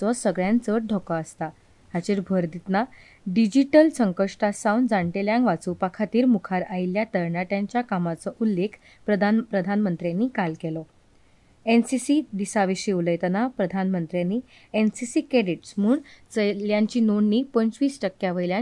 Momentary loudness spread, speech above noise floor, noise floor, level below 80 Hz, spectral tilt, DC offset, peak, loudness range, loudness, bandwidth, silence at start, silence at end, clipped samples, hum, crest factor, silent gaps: 8 LU; 33 dB; -57 dBFS; -62 dBFS; -6.5 dB/octave; under 0.1%; -4 dBFS; 3 LU; -24 LUFS; 11.5 kHz; 0 s; 0 s; under 0.1%; none; 18 dB; none